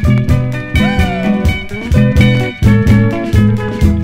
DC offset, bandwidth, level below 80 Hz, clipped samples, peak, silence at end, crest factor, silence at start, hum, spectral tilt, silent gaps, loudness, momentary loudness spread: under 0.1%; 15.5 kHz; -20 dBFS; 0.1%; 0 dBFS; 0 s; 10 dB; 0 s; none; -7.5 dB/octave; none; -12 LUFS; 6 LU